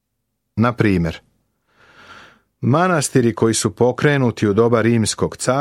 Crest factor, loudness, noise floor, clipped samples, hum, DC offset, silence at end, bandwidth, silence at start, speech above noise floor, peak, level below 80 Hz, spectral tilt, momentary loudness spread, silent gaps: 16 dB; -17 LUFS; -74 dBFS; under 0.1%; none; under 0.1%; 0 s; 14 kHz; 0.55 s; 58 dB; -2 dBFS; -48 dBFS; -5.5 dB/octave; 6 LU; none